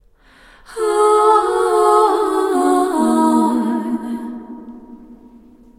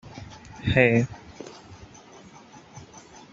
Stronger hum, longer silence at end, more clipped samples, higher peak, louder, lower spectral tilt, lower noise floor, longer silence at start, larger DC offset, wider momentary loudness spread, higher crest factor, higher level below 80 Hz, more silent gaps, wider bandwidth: neither; first, 0.65 s vs 0.5 s; neither; first, 0 dBFS vs -4 dBFS; first, -15 LUFS vs -22 LUFS; second, -4.5 dB/octave vs -6.5 dB/octave; about the same, -48 dBFS vs -49 dBFS; first, 0.7 s vs 0.05 s; neither; second, 19 LU vs 28 LU; second, 16 dB vs 26 dB; about the same, -52 dBFS vs -52 dBFS; neither; first, 15.5 kHz vs 7.8 kHz